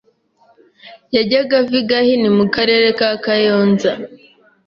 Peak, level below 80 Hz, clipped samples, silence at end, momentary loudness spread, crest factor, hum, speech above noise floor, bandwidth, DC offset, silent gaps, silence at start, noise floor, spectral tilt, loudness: -2 dBFS; -56 dBFS; under 0.1%; 0.55 s; 6 LU; 14 dB; none; 41 dB; 7.2 kHz; under 0.1%; none; 0.85 s; -55 dBFS; -6 dB/octave; -14 LUFS